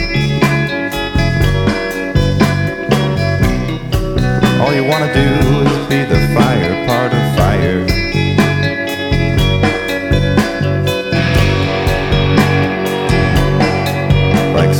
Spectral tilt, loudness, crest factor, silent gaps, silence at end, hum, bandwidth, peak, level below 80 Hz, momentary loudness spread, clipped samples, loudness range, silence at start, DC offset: -6.5 dB/octave; -13 LUFS; 12 dB; none; 0 s; none; 17.5 kHz; 0 dBFS; -24 dBFS; 4 LU; under 0.1%; 2 LU; 0 s; under 0.1%